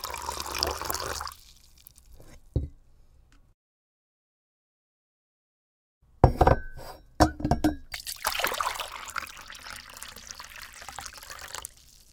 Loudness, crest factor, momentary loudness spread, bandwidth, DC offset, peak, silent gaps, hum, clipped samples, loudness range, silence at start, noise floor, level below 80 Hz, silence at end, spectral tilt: -29 LUFS; 32 dB; 18 LU; 19 kHz; under 0.1%; 0 dBFS; 3.54-6.01 s; none; under 0.1%; 16 LU; 0 s; -57 dBFS; -40 dBFS; 0.45 s; -4.5 dB/octave